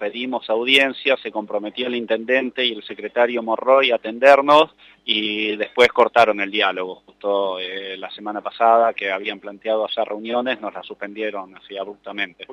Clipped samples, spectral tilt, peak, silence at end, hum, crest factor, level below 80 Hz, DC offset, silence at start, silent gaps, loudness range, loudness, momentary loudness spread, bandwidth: under 0.1%; -3.5 dB/octave; -2 dBFS; 0 s; none; 18 dB; -66 dBFS; under 0.1%; 0 s; none; 6 LU; -19 LUFS; 16 LU; 12 kHz